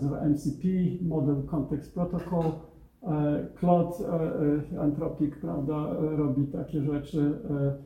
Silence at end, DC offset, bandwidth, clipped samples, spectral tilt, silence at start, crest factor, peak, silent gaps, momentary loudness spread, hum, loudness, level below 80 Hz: 0 s; under 0.1%; 13.5 kHz; under 0.1%; -10 dB/octave; 0 s; 18 dB; -10 dBFS; none; 5 LU; none; -29 LUFS; -50 dBFS